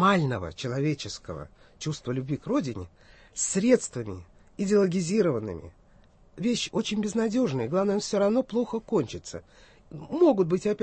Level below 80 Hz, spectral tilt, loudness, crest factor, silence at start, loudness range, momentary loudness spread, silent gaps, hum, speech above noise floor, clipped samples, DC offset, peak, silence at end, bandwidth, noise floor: -56 dBFS; -5.5 dB/octave; -27 LUFS; 18 dB; 0 s; 3 LU; 18 LU; none; none; 30 dB; under 0.1%; under 0.1%; -8 dBFS; 0 s; 8.8 kHz; -57 dBFS